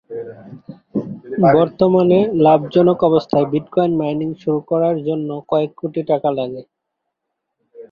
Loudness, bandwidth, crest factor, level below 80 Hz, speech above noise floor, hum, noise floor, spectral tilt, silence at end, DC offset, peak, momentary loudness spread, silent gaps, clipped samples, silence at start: -17 LUFS; 5.4 kHz; 16 dB; -56 dBFS; 62 dB; none; -77 dBFS; -10 dB/octave; 0.05 s; under 0.1%; -2 dBFS; 14 LU; none; under 0.1%; 0.1 s